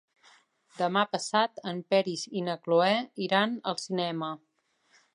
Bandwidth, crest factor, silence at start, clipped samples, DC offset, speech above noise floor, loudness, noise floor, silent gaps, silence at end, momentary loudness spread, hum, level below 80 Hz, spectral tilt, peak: 11.5 kHz; 20 dB; 0.75 s; under 0.1%; under 0.1%; 39 dB; -29 LUFS; -67 dBFS; none; 0.75 s; 8 LU; none; -82 dBFS; -4.5 dB/octave; -8 dBFS